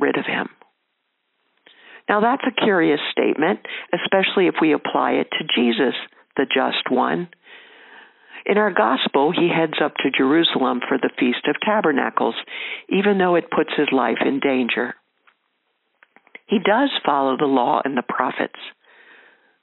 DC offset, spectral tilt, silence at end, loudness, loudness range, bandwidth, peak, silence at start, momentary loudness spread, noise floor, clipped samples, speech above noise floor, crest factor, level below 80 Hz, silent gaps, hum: under 0.1%; -2.5 dB/octave; 0.9 s; -20 LUFS; 3 LU; 4.2 kHz; 0 dBFS; 0 s; 9 LU; -73 dBFS; under 0.1%; 53 dB; 20 dB; -72 dBFS; none; none